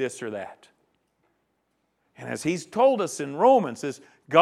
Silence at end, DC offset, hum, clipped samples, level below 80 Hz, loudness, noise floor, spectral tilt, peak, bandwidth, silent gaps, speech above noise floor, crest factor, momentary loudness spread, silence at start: 0 s; under 0.1%; none; under 0.1%; -72 dBFS; -24 LUFS; -74 dBFS; -5 dB/octave; -4 dBFS; 13 kHz; none; 49 dB; 22 dB; 19 LU; 0 s